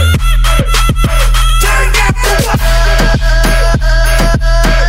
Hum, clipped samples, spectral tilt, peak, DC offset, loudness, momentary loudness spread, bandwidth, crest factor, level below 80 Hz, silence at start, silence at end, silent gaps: none; under 0.1%; -4 dB/octave; 0 dBFS; under 0.1%; -11 LUFS; 1 LU; 16.5 kHz; 8 dB; -10 dBFS; 0 s; 0 s; none